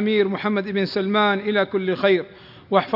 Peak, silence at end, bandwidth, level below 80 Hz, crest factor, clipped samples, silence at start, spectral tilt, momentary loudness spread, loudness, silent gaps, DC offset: -2 dBFS; 0 s; 5.8 kHz; -64 dBFS; 18 dB; under 0.1%; 0 s; -8 dB/octave; 4 LU; -21 LUFS; none; under 0.1%